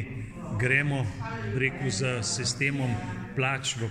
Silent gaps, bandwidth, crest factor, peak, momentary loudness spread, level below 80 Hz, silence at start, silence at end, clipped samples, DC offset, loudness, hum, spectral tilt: none; 11.5 kHz; 20 dB; -10 dBFS; 10 LU; -50 dBFS; 0 s; 0 s; under 0.1%; under 0.1%; -28 LUFS; none; -4 dB/octave